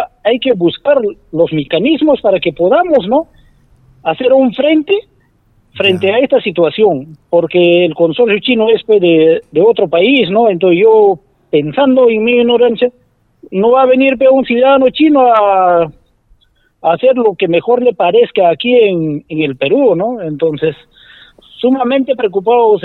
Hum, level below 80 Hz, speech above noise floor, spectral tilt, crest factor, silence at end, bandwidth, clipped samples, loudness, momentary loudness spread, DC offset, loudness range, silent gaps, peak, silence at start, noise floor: none; -50 dBFS; 42 dB; -8 dB/octave; 10 dB; 0.05 s; 4.3 kHz; under 0.1%; -11 LUFS; 7 LU; under 0.1%; 4 LU; none; 0 dBFS; 0 s; -52 dBFS